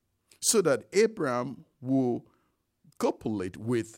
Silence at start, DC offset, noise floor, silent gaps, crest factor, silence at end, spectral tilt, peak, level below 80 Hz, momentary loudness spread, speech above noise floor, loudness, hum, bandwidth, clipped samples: 0.4 s; under 0.1%; -73 dBFS; none; 20 dB; 0 s; -4 dB/octave; -10 dBFS; -68 dBFS; 10 LU; 45 dB; -28 LUFS; none; 16 kHz; under 0.1%